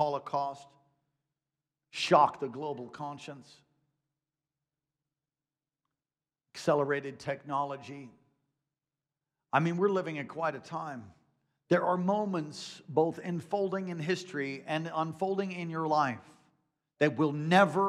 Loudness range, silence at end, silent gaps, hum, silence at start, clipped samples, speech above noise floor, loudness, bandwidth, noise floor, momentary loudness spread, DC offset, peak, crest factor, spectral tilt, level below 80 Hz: 5 LU; 0 s; none; none; 0 s; under 0.1%; over 59 dB; -31 LUFS; 12.5 kHz; under -90 dBFS; 16 LU; under 0.1%; -10 dBFS; 24 dB; -6 dB/octave; -82 dBFS